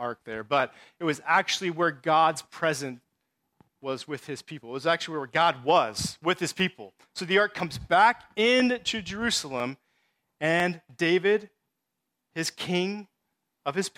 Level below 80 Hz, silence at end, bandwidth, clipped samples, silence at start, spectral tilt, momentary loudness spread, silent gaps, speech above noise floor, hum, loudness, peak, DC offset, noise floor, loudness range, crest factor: -62 dBFS; 0.1 s; 16 kHz; under 0.1%; 0 s; -3.5 dB/octave; 14 LU; none; 56 dB; none; -26 LUFS; -8 dBFS; under 0.1%; -83 dBFS; 4 LU; 18 dB